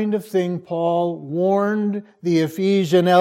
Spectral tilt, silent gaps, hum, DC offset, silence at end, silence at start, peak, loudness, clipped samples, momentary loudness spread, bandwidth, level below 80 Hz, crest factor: -7 dB/octave; none; none; under 0.1%; 0 s; 0 s; -2 dBFS; -20 LUFS; under 0.1%; 7 LU; 16 kHz; -70 dBFS; 16 dB